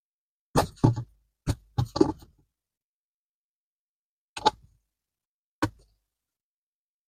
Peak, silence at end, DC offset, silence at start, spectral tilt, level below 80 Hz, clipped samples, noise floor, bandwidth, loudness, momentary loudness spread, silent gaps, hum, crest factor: -4 dBFS; 1.35 s; under 0.1%; 0.55 s; -6 dB/octave; -48 dBFS; under 0.1%; under -90 dBFS; 15.5 kHz; -28 LUFS; 14 LU; 2.84-4.36 s, 5.27-5.62 s; none; 28 dB